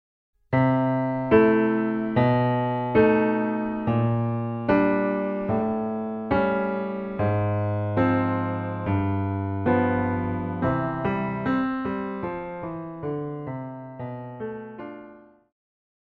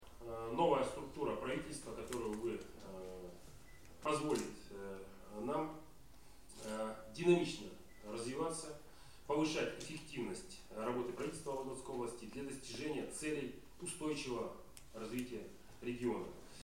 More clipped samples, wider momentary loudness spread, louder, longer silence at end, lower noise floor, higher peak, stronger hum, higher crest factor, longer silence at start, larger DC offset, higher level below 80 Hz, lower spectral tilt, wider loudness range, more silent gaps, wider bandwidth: neither; second, 14 LU vs 17 LU; first, -24 LUFS vs -42 LUFS; first, 0.85 s vs 0 s; second, -48 dBFS vs -62 dBFS; first, -6 dBFS vs -20 dBFS; neither; about the same, 18 dB vs 22 dB; first, 0.5 s vs 0 s; second, under 0.1% vs 0.1%; first, -50 dBFS vs -64 dBFS; first, -10.5 dB/octave vs -4.5 dB/octave; first, 10 LU vs 4 LU; neither; second, 5.2 kHz vs 16.5 kHz